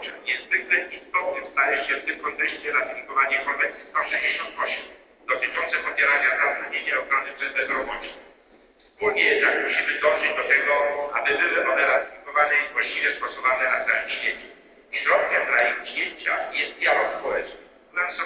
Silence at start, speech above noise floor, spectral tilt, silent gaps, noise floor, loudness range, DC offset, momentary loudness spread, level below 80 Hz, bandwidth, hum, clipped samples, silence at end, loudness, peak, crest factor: 0 s; 32 dB; -4.5 dB/octave; none; -56 dBFS; 3 LU; under 0.1%; 8 LU; -62 dBFS; 4 kHz; none; under 0.1%; 0 s; -22 LUFS; -4 dBFS; 20 dB